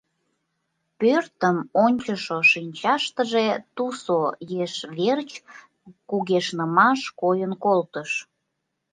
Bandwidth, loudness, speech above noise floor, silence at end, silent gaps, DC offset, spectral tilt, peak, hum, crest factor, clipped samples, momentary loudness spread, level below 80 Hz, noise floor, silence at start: 9.6 kHz; -23 LUFS; 56 dB; 0.7 s; none; under 0.1%; -5 dB/octave; -4 dBFS; none; 20 dB; under 0.1%; 11 LU; -72 dBFS; -78 dBFS; 1 s